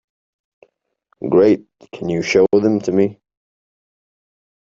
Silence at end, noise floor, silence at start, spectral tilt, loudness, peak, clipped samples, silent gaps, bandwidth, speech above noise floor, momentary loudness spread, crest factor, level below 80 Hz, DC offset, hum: 1.55 s; -65 dBFS; 1.2 s; -6.5 dB/octave; -16 LUFS; -2 dBFS; under 0.1%; none; 7.6 kHz; 49 dB; 10 LU; 18 dB; -56 dBFS; under 0.1%; none